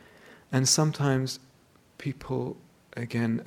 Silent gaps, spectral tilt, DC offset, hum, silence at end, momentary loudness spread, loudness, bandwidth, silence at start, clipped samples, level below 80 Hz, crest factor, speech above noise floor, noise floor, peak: none; -4.5 dB/octave; under 0.1%; none; 0 s; 17 LU; -28 LUFS; 19 kHz; 0.3 s; under 0.1%; -62 dBFS; 18 dB; 33 dB; -60 dBFS; -10 dBFS